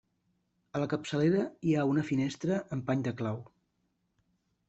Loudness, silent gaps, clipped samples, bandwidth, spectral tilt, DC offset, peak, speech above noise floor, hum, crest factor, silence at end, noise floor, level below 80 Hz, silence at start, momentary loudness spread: -31 LUFS; none; under 0.1%; 8.2 kHz; -7 dB/octave; under 0.1%; -16 dBFS; 47 dB; none; 16 dB; 1.25 s; -78 dBFS; -68 dBFS; 0.75 s; 8 LU